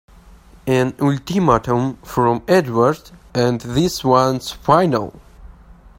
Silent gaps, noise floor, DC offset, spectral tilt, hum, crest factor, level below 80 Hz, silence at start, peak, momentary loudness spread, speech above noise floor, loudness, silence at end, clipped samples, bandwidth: none; -44 dBFS; under 0.1%; -6 dB/octave; none; 18 dB; -42 dBFS; 0.65 s; 0 dBFS; 8 LU; 28 dB; -17 LUFS; 0.5 s; under 0.1%; 16.5 kHz